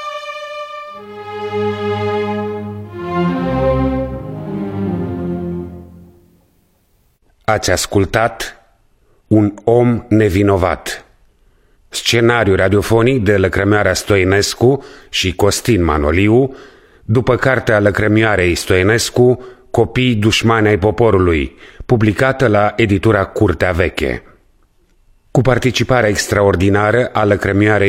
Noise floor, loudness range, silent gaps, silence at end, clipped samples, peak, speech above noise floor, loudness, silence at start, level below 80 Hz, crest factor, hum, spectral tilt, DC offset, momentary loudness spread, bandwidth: -57 dBFS; 7 LU; none; 0 s; under 0.1%; 0 dBFS; 44 dB; -14 LUFS; 0 s; -34 dBFS; 14 dB; none; -5.5 dB/octave; under 0.1%; 13 LU; 16 kHz